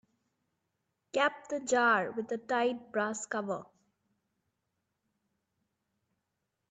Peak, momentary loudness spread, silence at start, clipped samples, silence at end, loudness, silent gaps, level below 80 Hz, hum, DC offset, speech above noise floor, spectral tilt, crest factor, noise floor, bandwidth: -14 dBFS; 11 LU; 1.15 s; under 0.1%; 3.1 s; -32 LUFS; none; -82 dBFS; none; under 0.1%; 53 dB; -3 dB/octave; 22 dB; -84 dBFS; 9 kHz